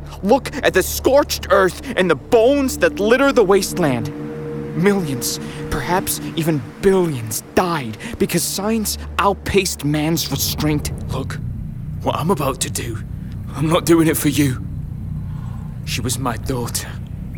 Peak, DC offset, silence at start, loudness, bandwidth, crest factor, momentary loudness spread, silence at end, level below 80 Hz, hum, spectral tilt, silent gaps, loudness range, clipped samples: -2 dBFS; under 0.1%; 0 s; -19 LUFS; over 20 kHz; 16 dB; 13 LU; 0 s; -36 dBFS; none; -4.5 dB/octave; none; 5 LU; under 0.1%